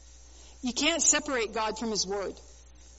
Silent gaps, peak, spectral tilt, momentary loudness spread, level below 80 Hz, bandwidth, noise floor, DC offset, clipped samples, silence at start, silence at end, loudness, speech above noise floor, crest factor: none; -10 dBFS; -1 dB/octave; 12 LU; -54 dBFS; 8 kHz; -51 dBFS; under 0.1%; under 0.1%; 0.05 s; 0 s; -27 LUFS; 22 dB; 22 dB